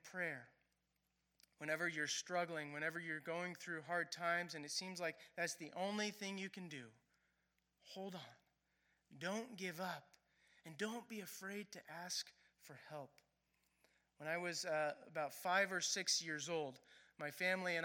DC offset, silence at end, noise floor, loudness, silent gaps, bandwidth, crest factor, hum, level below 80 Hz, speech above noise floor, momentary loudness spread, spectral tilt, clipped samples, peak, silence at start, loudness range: under 0.1%; 0 s; -86 dBFS; -44 LUFS; none; 17.5 kHz; 22 dB; none; under -90 dBFS; 41 dB; 16 LU; -2.5 dB/octave; under 0.1%; -24 dBFS; 0.05 s; 10 LU